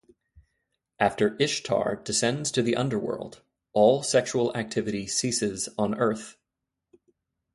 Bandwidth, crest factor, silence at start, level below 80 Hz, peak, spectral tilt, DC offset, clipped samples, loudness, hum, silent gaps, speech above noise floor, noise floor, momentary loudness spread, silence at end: 11.5 kHz; 20 dB; 0.35 s; -62 dBFS; -8 dBFS; -4 dB/octave; under 0.1%; under 0.1%; -26 LUFS; none; none; 59 dB; -85 dBFS; 9 LU; 1.2 s